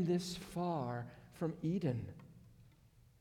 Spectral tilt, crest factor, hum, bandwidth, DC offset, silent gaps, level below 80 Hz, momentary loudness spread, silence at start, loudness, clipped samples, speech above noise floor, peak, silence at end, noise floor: -6.5 dB/octave; 16 dB; none; 15.5 kHz; under 0.1%; none; -68 dBFS; 15 LU; 0 s; -40 LUFS; under 0.1%; 27 dB; -26 dBFS; 0.5 s; -66 dBFS